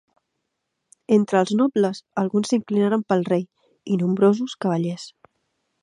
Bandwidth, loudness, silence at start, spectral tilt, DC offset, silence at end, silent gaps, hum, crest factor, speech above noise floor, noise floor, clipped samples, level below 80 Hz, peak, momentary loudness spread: 10.5 kHz; -21 LUFS; 1.1 s; -7 dB/octave; under 0.1%; 0.75 s; none; none; 18 dB; 57 dB; -78 dBFS; under 0.1%; -70 dBFS; -4 dBFS; 10 LU